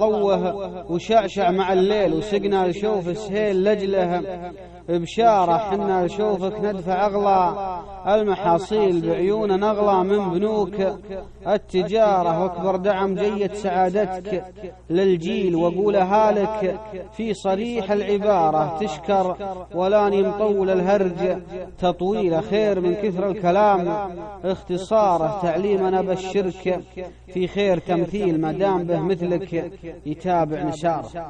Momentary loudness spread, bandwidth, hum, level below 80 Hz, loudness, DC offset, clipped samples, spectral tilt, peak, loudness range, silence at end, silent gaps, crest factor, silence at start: 10 LU; 9 kHz; none; -48 dBFS; -21 LUFS; under 0.1%; under 0.1%; -7 dB/octave; -6 dBFS; 2 LU; 0 s; none; 16 dB; 0 s